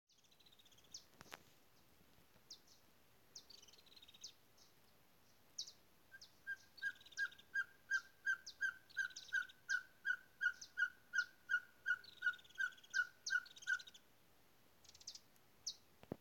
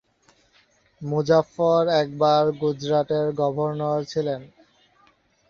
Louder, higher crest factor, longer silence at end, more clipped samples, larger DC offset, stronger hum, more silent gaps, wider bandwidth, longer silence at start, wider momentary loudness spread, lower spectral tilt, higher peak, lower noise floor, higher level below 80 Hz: second, -44 LUFS vs -22 LUFS; about the same, 20 dB vs 18 dB; second, 0.05 s vs 1.05 s; neither; neither; neither; neither; first, 17 kHz vs 7.2 kHz; about the same, 0.95 s vs 1 s; first, 18 LU vs 8 LU; second, 0 dB/octave vs -6.5 dB/octave; second, -28 dBFS vs -6 dBFS; first, -73 dBFS vs -61 dBFS; second, -86 dBFS vs -62 dBFS